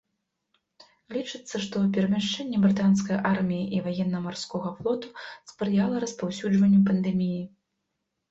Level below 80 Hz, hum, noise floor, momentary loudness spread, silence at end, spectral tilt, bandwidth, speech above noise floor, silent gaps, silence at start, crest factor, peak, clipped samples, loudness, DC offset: -62 dBFS; none; -81 dBFS; 13 LU; 0.85 s; -6.5 dB/octave; 8 kHz; 55 dB; none; 1.1 s; 16 dB; -10 dBFS; under 0.1%; -26 LUFS; under 0.1%